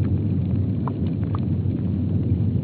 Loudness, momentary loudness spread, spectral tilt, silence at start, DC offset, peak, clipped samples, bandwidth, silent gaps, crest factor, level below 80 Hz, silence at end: -24 LUFS; 2 LU; -11 dB/octave; 0 s; under 0.1%; -10 dBFS; under 0.1%; 4.3 kHz; none; 12 dB; -40 dBFS; 0 s